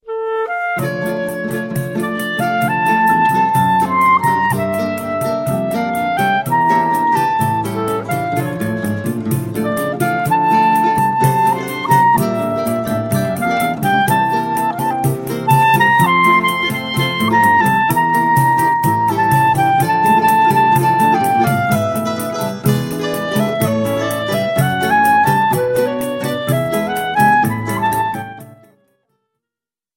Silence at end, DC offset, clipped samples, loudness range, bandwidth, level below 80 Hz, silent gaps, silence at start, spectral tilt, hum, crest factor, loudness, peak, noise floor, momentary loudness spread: 1.45 s; under 0.1%; under 0.1%; 5 LU; 17 kHz; -50 dBFS; none; 0.05 s; -5.5 dB/octave; none; 14 dB; -15 LUFS; 0 dBFS; -88 dBFS; 8 LU